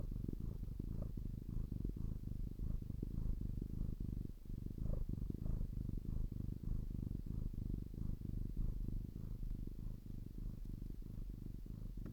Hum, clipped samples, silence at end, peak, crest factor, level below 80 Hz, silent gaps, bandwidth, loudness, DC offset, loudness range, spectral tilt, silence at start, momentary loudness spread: none; under 0.1%; 0 s; -28 dBFS; 14 dB; -46 dBFS; none; 17.5 kHz; -48 LUFS; under 0.1%; 3 LU; -9.5 dB/octave; 0 s; 6 LU